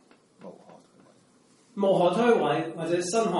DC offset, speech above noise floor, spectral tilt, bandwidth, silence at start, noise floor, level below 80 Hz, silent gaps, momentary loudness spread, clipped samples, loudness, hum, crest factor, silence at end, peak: under 0.1%; 37 dB; -5 dB/octave; 11.5 kHz; 0.45 s; -61 dBFS; -74 dBFS; none; 13 LU; under 0.1%; -25 LUFS; none; 18 dB; 0 s; -10 dBFS